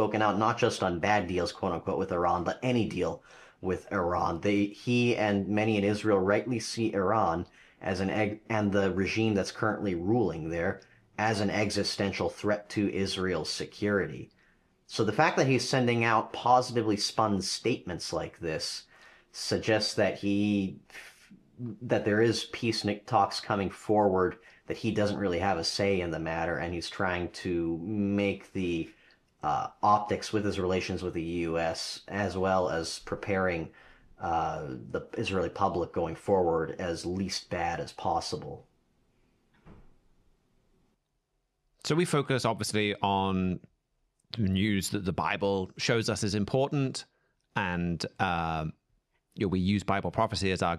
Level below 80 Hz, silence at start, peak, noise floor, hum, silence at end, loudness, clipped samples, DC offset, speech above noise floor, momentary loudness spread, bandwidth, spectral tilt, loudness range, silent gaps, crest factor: -58 dBFS; 0 s; -8 dBFS; -78 dBFS; none; 0 s; -30 LUFS; under 0.1%; under 0.1%; 49 dB; 9 LU; 14 kHz; -5 dB/octave; 4 LU; none; 22 dB